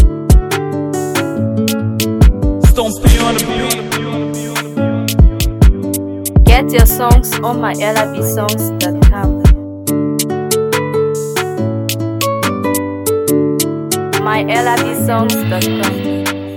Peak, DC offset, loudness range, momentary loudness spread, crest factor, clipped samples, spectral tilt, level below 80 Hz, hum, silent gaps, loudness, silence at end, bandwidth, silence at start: 0 dBFS; under 0.1%; 4 LU; 7 LU; 12 dB; under 0.1%; -5 dB/octave; -16 dBFS; none; none; -14 LUFS; 0 s; 18.5 kHz; 0 s